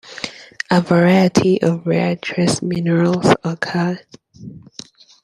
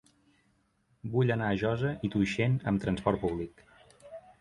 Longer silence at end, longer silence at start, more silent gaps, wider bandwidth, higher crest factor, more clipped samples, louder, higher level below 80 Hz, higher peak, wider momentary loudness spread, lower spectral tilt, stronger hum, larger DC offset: first, 0.65 s vs 0.2 s; second, 0.05 s vs 1.05 s; neither; about the same, 11.5 kHz vs 11 kHz; about the same, 16 dB vs 20 dB; neither; first, -16 LUFS vs -30 LUFS; about the same, -54 dBFS vs -54 dBFS; first, 0 dBFS vs -12 dBFS; first, 22 LU vs 17 LU; second, -6 dB/octave vs -7.5 dB/octave; neither; neither